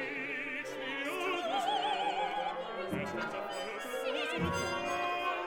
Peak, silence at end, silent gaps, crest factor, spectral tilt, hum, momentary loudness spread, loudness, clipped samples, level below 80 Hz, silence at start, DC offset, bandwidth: -20 dBFS; 0 s; none; 14 dB; -4 dB/octave; none; 6 LU; -35 LUFS; under 0.1%; -62 dBFS; 0 s; under 0.1%; 18 kHz